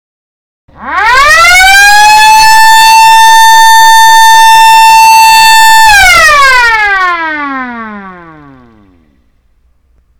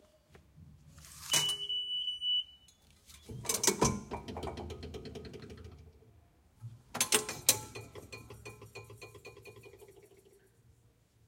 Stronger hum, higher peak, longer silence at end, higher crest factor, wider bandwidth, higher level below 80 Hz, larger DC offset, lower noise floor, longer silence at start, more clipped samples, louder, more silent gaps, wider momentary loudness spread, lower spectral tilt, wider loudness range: neither; first, 0 dBFS vs -8 dBFS; second, 0 s vs 1.2 s; second, 4 dB vs 32 dB; first, over 20 kHz vs 16.5 kHz; first, -30 dBFS vs -60 dBFS; neither; second, -49 dBFS vs -67 dBFS; first, 0.7 s vs 0.35 s; first, 10% vs under 0.1%; first, -1 LUFS vs -32 LUFS; neither; second, 12 LU vs 23 LU; second, 0.5 dB/octave vs -1.5 dB/octave; second, 9 LU vs 13 LU